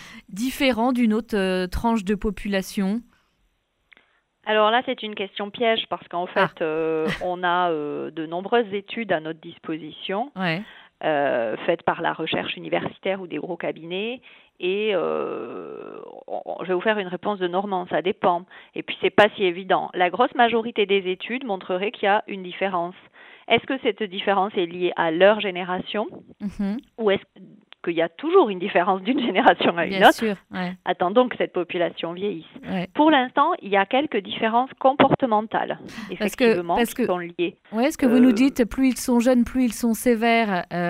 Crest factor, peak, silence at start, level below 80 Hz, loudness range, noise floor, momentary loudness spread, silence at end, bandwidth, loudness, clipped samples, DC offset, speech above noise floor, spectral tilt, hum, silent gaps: 20 dB; -2 dBFS; 0 s; -50 dBFS; 6 LU; -69 dBFS; 12 LU; 0 s; 16 kHz; -23 LUFS; under 0.1%; under 0.1%; 46 dB; -5 dB/octave; none; none